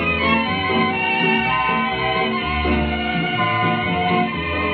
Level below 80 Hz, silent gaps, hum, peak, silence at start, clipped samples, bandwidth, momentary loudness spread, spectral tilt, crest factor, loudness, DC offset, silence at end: -34 dBFS; none; none; -4 dBFS; 0 s; under 0.1%; 5.8 kHz; 4 LU; -3 dB/octave; 16 dB; -19 LUFS; under 0.1%; 0 s